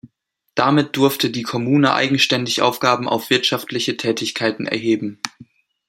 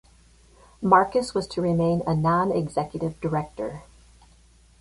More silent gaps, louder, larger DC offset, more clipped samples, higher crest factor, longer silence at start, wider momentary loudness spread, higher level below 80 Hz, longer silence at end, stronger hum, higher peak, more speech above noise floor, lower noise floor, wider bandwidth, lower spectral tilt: neither; first, -18 LUFS vs -24 LUFS; neither; neither; about the same, 20 dB vs 22 dB; second, 0.05 s vs 0.8 s; second, 7 LU vs 13 LU; second, -64 dBFS vs -52 dBFS; second, 0.45 s vs 0.95 s; neither; first, 0 dBFS vs -4 dBFS; first, 50 dB vs 32 dB; first, -69 dBFS vs -55 dBFS; first, 16.5 kHz vs 11.5 kHz; second, -4.5 dB/octave vs -7 dB/octave